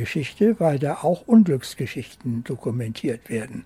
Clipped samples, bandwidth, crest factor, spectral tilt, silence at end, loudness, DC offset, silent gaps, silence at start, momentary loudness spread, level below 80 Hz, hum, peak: under 0.1%; 14 kHz; 16 dB; -7 dB/octave; 0.05 s; -23 LUFS; under 0.1%; none; 0 s; 13 LU; -58 dBFS; none; -6 dBFS